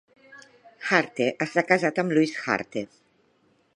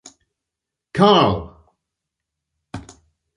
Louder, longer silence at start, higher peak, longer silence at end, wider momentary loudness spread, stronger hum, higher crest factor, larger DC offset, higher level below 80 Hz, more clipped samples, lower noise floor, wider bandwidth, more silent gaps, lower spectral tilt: second, -24 LUFS vs -16 LUFS; second, 0.3 s vs 0.95 s; about the same, -2 dBFS vs -2 dBFS; first, 0.95 s vs 0.55 s; second, 12 LU vs 24 LU; neither; about the same, 24 dB vs 20 dB; neither; second, -72 dBFS vs -46 dBFS; neither; second, -65 dBFS vs -84 dBFS; about the same, 10.5 kHz vs 11 kHz; neither; about the same, -5.5 dB/octave vs -6 dB/octave